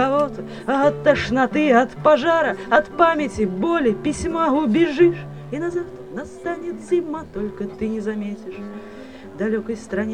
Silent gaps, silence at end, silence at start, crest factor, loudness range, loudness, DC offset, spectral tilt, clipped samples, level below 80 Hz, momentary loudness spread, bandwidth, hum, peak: none; 0 s; 0 s; 20 dB; 9 LU; -20 LUFS; 0.3%; -6 dB/octave; under 0.1%; -46 dBFS; 16 LU; 9.8 kHz; none; 0 dBFS